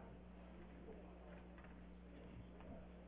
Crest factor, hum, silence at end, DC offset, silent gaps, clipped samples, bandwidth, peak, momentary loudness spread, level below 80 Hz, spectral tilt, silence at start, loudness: 12 dB; 60 Hz at -60 dBFS; 0 s; under 0.1%; none; under 0.1%; 3.8 kHz; -46 dBFS; 2 LU; -62 dBFS; -6 dB/octave; 0 s; -59 LUFS